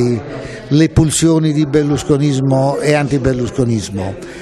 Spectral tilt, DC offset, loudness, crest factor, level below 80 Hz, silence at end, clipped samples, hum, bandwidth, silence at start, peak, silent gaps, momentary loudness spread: -6 dB/octave; under 0.1%; -14 LUFS; 14 dB; -34 dBFS; 0 s; under 0.1%; none; 13 kHz; 0 s; 0 dBFS; none; 10 LU